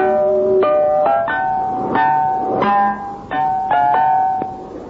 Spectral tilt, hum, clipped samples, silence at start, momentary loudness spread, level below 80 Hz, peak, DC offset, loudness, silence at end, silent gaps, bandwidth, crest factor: -7.5 dB/octave; none; under 0.1%; 0 s; 6 LU; -50 dBFS; -4 dBFS; under 0.1%; -16 LUFS; 0 s; none; 6 kHz; 12 dB